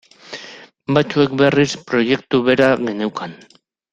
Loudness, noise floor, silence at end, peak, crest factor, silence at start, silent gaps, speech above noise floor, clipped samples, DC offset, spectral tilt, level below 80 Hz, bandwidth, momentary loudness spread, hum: -17 LUFS; -40 dBFS; 0.6 s; -2 dBFS; 16 dB; 0.3 s; none; 23 dB; under 0.1%; under 0.1%; -5.5 dB/octave; -54 dBFS; 9 kHz; 19 LU; none